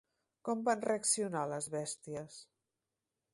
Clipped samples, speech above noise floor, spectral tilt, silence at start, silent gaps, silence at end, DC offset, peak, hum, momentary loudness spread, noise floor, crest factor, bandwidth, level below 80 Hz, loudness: under 0.1%; 53 dB; -3.5 dB/octave; 0.45 s; none; 0.9 s; under 0.1%; -18 dBFS; none; 14 LU; -89 dBFS; 20 dB; 12 kHz; -80 dBFS; -36 LUFS